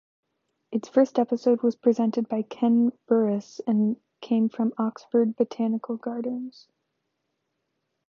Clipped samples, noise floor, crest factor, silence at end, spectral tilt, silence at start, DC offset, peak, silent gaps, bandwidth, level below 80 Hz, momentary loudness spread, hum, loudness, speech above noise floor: under 0.1%; -79 dBFS; 18 dB; 1.6 s; -8 dB/octave; 0.7 s; under 0.1%; -8 dBFS; none; 7 kHz; -80 dBFS; 9 LU; none; -25 LUFS; 54 dB